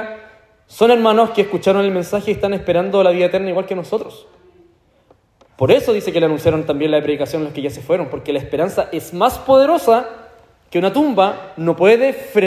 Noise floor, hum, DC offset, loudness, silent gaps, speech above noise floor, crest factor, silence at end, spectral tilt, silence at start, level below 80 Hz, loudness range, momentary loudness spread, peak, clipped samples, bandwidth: -54 dBFS; none; under 0.1%; -16 LUFS; none; 39 dB; 16 dB; 0 s; -6 dB/octave; 0 s; -48 dBFS; 4 LU; 10 LU; 0 dBFS; under 0.1%; 15.5 kHz